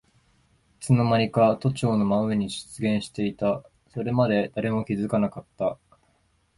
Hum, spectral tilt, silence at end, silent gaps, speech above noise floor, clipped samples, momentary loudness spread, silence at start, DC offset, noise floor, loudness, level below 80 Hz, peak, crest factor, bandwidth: none; -7 dB/octave; 0.85 s; none; 43 dB; under 0.1%; 10 LU; 0.8 s; under 0.1%; -66 dBFS; -25 LUFS; -56 dBFS; -8 dBFS; 18 dB; 11.5 kHz